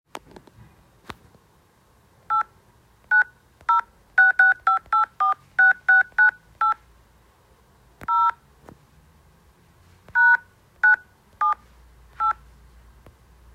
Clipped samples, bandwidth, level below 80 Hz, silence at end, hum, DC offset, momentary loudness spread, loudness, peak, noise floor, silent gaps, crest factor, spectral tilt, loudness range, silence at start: under 0.1%; 9.4 kHz; -58 dBFS; 1.2 s; none; under 0.1%; 13 LU; -20 LUFS; -6 dBFS; -59 dBFS; none; 18 dB; -2.5 dB/octave; 9 LU; 2.3 s